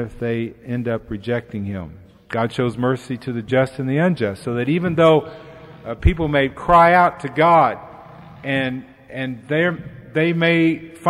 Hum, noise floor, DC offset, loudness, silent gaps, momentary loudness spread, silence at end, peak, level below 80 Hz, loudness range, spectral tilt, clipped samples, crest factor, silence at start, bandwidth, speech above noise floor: none; -40 dBFS; under 0.1%; -19 LUFS; none; 17 LU; 0 s; -2 dBFS; -36 dBFS; 7 LU; -7.5 dB/octave; under 0.1%; 16 dB; 0 s; 12.5 kHz; 22 dB